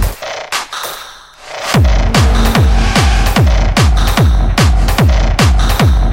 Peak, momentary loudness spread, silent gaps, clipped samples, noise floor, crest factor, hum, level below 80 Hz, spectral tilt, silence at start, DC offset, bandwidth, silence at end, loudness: 0 dBFS; 11 LU; none; under 0.1%; -33 dBFS; 10 dB; none; -12 dBFS; -5 dB/octave; 0 s; under 0.1%; 16.5 kHz; 0 s; -12 LUFS